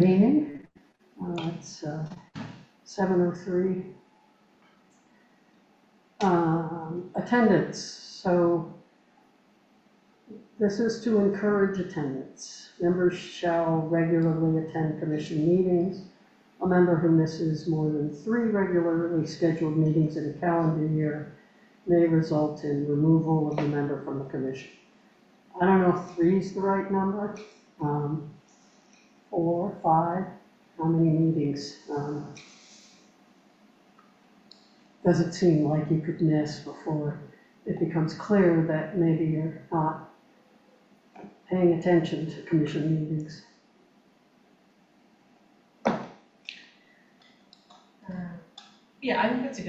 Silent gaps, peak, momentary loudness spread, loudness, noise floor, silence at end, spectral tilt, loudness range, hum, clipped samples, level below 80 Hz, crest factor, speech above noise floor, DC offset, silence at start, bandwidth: none; -8 dBFS; 17 LU; -26 LUFS; -62 dBFS; 0 s; -8 dB/octave; 9 LU; none; under 0.1%; -64 dBFS; 18 dB; 36 dB; under 0.1%; 0 s; 8.2 kHz